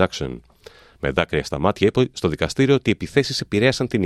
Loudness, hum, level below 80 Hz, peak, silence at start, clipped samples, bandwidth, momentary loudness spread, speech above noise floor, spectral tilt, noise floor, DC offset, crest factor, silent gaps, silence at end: -20 LUFS; none; -44 dBFS; -2 dBFS; 0 s; under 0.1%; 13 kHz; 9 LU; 27 dB; -5.5 dB/octave; -47 dBFS; under 0.1%; 18 dB; none; 0 s